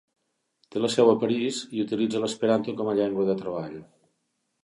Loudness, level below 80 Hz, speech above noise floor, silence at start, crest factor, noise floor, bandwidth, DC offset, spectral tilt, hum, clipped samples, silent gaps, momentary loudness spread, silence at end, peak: -25 LUFS; -68 dBFS; 52 dB; 0.75 s; 20 dB; -76 dBFS; 11.5 kHz; under 0.1%; -5.5 dB/octave; none; under 0.1%; none; 13 LU; 0.8 s; -6 dBFS